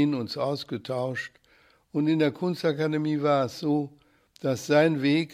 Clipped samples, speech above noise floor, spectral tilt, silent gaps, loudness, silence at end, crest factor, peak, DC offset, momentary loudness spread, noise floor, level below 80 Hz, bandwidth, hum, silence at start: under 0.1%; 36 dB; -6.5 dB/octave; none; -26 LUFS; 0 s; 18 dB; -8 dBFS; under 0.1%; 11 LU; -61 dBFS; -72 dBFS; 14.5 kHz; none; 0 s